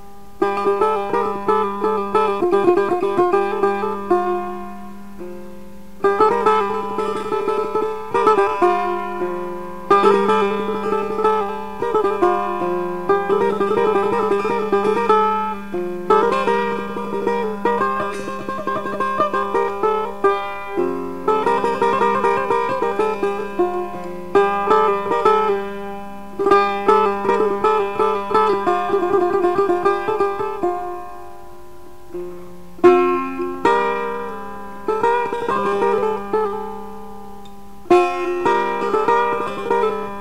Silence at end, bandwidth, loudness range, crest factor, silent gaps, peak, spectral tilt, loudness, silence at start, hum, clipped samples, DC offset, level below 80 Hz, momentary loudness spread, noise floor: 0 s; 15 kHz; 3 LU; 16 dB; none; -2 dBFS; -6 dB/octave; -19 LUFS; 0 s; none; under 0.1%; 2%; -52 dBFS; 13 LU; -42 dBFS